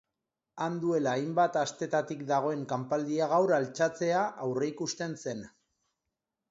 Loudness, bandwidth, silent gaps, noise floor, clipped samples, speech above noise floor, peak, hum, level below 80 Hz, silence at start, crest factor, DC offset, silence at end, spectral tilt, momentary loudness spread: -30 LUFS; 8 kHz; none; -87 dBFS; under 0.1%; 57 dB; -14 dBFS; none; -76 dBFS; 0.55 s; 18 dB; under 0.1%; 1 s; -5 dB/octave; 8 LU